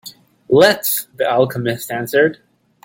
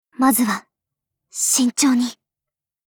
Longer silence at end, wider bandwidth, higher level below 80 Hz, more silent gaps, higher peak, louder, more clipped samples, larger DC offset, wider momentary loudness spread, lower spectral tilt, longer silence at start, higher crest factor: second, 0.5 s vs 0.75 s; second, 17 kHz vs over 20 kHz; first, -56 dBFS vs -66 dBFS; neither; first, 0 dBFS vs -4 dBFS; about the same, -16 LUFS vs -18 LUFS; neither; neither; about the same, 10 LU vs 11 LU; first, -4 dB/octave vs -2 dB/octave; second, 0.05 s vs 0.2 s; about the same, 16 dB vs 16 dB